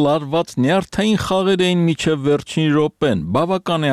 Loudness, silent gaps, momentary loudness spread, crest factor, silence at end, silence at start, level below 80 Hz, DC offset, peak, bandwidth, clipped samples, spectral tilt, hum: -18 LUFS; none; 3 LU; 12 dB; 0 s; 0 s; -46 dBFS; under 0.1%; -6 dBFS; 13.5 kHz; under 0.1%; -6 dB/octave; none